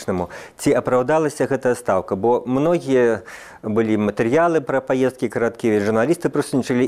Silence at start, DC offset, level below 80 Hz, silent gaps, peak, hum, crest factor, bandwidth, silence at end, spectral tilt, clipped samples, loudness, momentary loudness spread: 0 s; under 0.1%; -54 dBFS; none; -4 dBFS; none; 14 dB; 15 kHz; 0 s; -6.5 dB/octave; under 0.1%; -19 LUFS; 6 LU